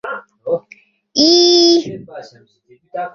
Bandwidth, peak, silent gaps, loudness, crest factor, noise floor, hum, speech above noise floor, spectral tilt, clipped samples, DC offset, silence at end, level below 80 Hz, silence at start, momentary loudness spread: 7.2 kHz; 0 dBFS; none; -12 LUFS; 16 dB; -47 dBFS; none; 31 dB; -3 dB/octave; under 0.1%; under 0.1%; 0.05 s; -60 dBFS; 0.05 s; 22 LU